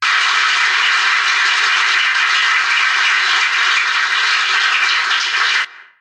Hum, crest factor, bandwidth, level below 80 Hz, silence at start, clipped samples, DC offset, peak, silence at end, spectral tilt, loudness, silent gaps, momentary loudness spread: none; 12 dB; 11.5 kHz; under -90 dBFS; 0 s; under 0.1%; under 0.1%; -2 dBFS; 0.15 s; 4 dB/octave; -12 LUFS; none; 2 LU